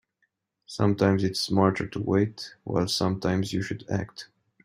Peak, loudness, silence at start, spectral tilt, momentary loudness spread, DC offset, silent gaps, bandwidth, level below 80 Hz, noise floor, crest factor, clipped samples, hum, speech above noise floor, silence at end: -6 dBFS; -26 LUFS; 0.7 s; -6 dB/octave; 10 LU; under 0.1%; none; 16 kHz; -58 dBFS; -75 dBFS; 22 dB; under 0.1%; none; 49 dB; 0.4 s